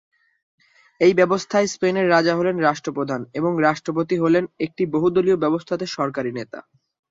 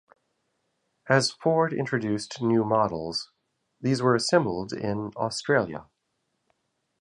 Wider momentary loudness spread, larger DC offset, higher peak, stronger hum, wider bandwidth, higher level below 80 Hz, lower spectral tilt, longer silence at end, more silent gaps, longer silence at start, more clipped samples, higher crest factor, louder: about the same, 9 LU vs 10 LU; neither; about the same, -4 dBFS vs -6 dBFS; neither; second, 7.8 kHz vs 11 kHz; about the same, -62 dBFS vs -62 dBFS; about the same, -5.5 dB/octave vs -5 dB/octave; second, 0.5 s vs 1.2 s; neither; about the same, 1 s vs 1.05 s; neither; about the same, 18 dB vs 22 dB; first, -20 LUFS vs -26 LUFS